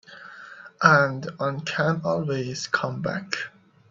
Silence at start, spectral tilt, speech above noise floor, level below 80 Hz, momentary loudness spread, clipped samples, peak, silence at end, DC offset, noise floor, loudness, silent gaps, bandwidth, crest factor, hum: 0.1 s; -5 dB/octave; 20 dB; -64 dBFS; 24 LU; under 0.1%; -2 dBFS; 0.4 s; under 0.1%; -44 dBFS; -24 LUFS; none; 7.8 kHz; 24 dB; none